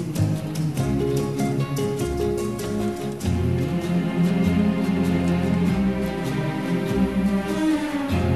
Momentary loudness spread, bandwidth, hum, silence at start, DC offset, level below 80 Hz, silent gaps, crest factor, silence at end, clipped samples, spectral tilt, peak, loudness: 5 LU; 13.5 kHz; none; 0 s; 0.3%; -40 dBFS; none; 14 dB; 0 s; under 0.1%; -7 dB/octave; -10 dBFS; -23 LUFS